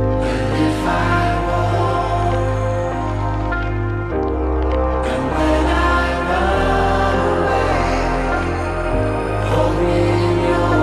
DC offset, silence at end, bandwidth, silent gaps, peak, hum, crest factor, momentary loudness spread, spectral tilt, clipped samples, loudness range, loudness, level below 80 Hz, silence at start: under 0.1%; 0 s; 12 kHz; none; -4 dBFS; none; 14 dB; 5 LU; -7 dB/octave; under 0.1%; 3 LU; -18 LUFS; -24 dBFS; 0 s